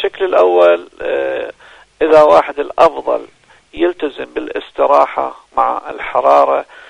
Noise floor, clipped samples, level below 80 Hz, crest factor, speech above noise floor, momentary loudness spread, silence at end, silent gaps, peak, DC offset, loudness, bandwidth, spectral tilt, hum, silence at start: -42 dBFS; 0.2%; -48 dBFS; 14 dB; 29 dB; 13 LU; 0.25 s; none; 0 dBFS; under 0.1%; -13 LUFS; 10 kHz; -5 dB/octave; none; 0 s